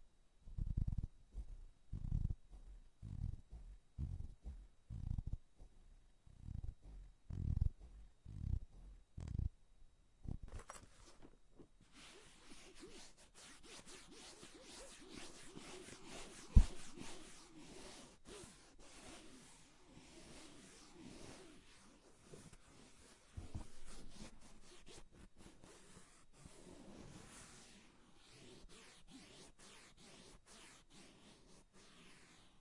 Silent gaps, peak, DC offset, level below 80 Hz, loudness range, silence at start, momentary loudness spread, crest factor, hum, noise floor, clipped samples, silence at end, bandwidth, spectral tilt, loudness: none; -14 dBFS; under 0.1%; -50 dBFS; 17 LU; 0 s; 18 LU; 32 dB; none; -65 dBFS; under 0.1%; 0 s; 11.5 kHz; -5.5 dB/octave; -50 LUFS